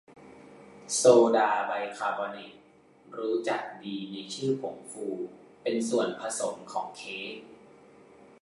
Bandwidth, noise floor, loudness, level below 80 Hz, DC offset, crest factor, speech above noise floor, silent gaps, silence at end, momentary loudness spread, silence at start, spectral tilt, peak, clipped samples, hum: 11.5 kHz; -58 dBFS; -29 LUFS; -76 dBFS; under 0.1%; 24 dB; 29 dB; none; 0.85 s; 18 LU; 0.1 s; -3.5 dB/octave; -6 dBFS; under 0.1%; none